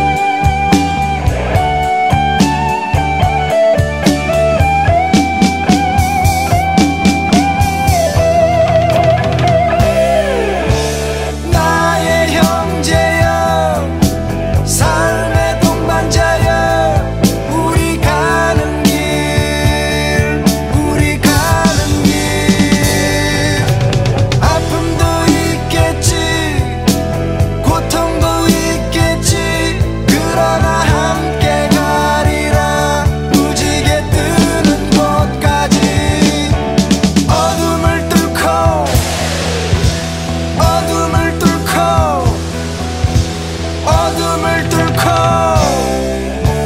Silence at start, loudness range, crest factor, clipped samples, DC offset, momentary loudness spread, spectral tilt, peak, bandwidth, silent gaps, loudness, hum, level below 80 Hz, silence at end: 0 s; 2 LU; 12 dB; 0.2%; 0.6%; 4 LU; -5 dB/octave; 0 dBFS; 16.5 kHz; none; -12 LUFS; none; -22 dBFS; 0 s